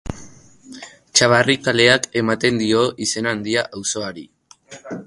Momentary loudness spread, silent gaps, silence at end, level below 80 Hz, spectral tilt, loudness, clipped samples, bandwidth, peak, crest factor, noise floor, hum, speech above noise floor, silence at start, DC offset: 24 LU; none; 0 s; -48 dBFS; -3 dB/octave; -17 LUFS; under 0.1%; 11.5 kHz; 0 dBFS; 20 dB; -43 dBFS; none; 24 dB; 0.05 s; under 0.1%